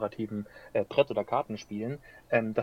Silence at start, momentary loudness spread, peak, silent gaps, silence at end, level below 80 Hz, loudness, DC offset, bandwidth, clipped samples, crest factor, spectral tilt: 0 s; 10 LU; -10 dBFS; none; 0 s; -64 dBFS; -31 LUFS; under 0.1%; 14 kHz; under 0.1%; 20 dB; -6.5 dB/octave